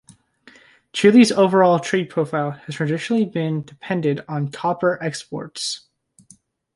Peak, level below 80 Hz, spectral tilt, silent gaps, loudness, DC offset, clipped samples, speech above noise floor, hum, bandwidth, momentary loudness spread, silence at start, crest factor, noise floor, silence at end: -2 dBFS; -66 dBFS; -5.5 dB/octave; none; -20 LUFS; under 0.1%; under 0.1%; 35 dB; none; 11.5 kHz; 14 LU; 0.95 s; 18 dB; -54 dBFS; 0.95 s